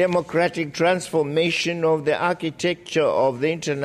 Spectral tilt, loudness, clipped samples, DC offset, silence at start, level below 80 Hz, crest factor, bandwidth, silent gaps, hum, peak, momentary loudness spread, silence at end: -5 dB/octave; -22 LUFS; under 0.1%; under 0.1%; 0 s; -62 dBFS; 14 dB; 14 kHz; none; none; -8 dBFS; 4 LU; 0 s